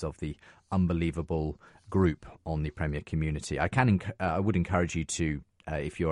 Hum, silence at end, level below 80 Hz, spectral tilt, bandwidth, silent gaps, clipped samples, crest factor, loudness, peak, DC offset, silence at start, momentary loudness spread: none; 0 s; -44 dBFS; -6.5 dB/octave; 11.5 kHz; none; under 0.1%; 20 dB; -30 LUFS; -10 dBFS; under 0.1%; 0 s; 11 LU